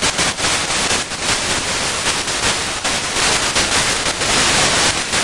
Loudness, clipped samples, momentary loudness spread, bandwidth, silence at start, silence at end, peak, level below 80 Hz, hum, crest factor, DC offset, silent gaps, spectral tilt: -15 LUFS; under 0.1%; 5 LU; 11.5 kHz; 0 s; 0 s; -2 dBFS; -36 dBFS; none; 14 dB; under 0.1%; none; -1 dB/octave